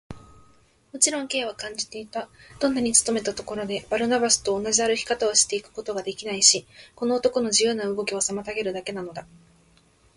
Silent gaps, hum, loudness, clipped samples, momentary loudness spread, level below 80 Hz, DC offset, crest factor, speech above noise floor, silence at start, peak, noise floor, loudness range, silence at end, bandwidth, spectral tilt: none; none; -23 LUFS; under 0.1%; 14 LU; -58 dBFS; under 0.1%; 24 dB; 34 dB; 0.1 s; -2 dBFS; -59 dBFS; 4 LU; 0.9 s; 11.5 kHz; -1.5 dB/octave